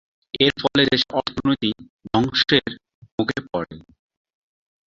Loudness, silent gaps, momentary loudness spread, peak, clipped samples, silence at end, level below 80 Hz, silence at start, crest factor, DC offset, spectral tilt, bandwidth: -20 LUFS; 1.90-1.99 s, 2.94-3.02 s, 3.12-3.18 s; 17 LU; -2 dBFS; under 0.1%; 1.1 s; -50 dBFS; 0.35 s; 22 dB; under 0.1%; -5.5 dB/octave; 7.6 kHz